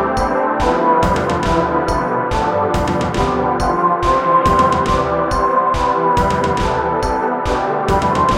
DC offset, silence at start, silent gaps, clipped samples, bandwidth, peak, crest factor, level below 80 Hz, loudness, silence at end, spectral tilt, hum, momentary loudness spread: under 0.1%; 0 s; none; under 0.1%; 15.5 kHz; -2 dBFS; 14 dB; -28 dBFS; -16 LUFS; 0 s; -6 dB/octave; none; 4 LU